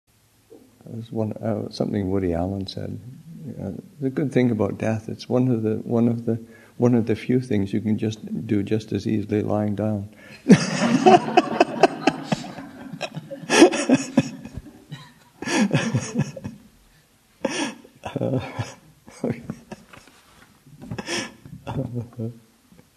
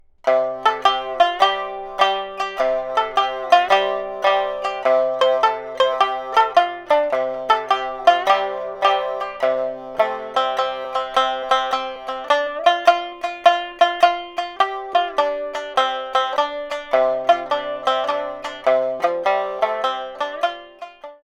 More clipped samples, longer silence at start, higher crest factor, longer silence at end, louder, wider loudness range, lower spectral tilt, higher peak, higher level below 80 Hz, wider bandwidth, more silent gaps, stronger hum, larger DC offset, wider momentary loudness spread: neither; first, 0.5 s vs 0.25 s; about the same, 24 dB vs 20 dB; first, 0.6 s vs 0.1 s; second, -23 LUFS vs -20 LUFS; first, 12 LU vs 3 LU; first, -6 dB/octave vs -2 dB/octave; about the same, 0 dBFS vs 0 dBFS; about the same, -56 dBFS vs -58 dBFS; first, 13.5 kHz vs 11.5 kHz; neither; neither; neither; first, 21 LU vs 9 LU